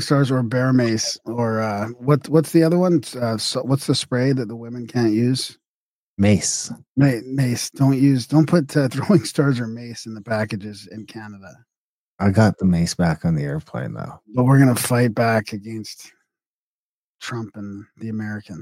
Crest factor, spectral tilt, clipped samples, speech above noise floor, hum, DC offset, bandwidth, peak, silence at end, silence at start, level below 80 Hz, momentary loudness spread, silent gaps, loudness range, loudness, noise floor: 16 dB; -6 dB/octave; under 0.1%; over 70 dB; none; under 0.1%; 16.5 kHz; -4 dBFS; 0 s; 0 s; -52 dBFS; 16 LU; 5.67-6.17 s, 6.88-6.95 s, 11.77-12.18 s, 16.46-17.19 s; 5 LU; -20 LUFS; under -90 dBFS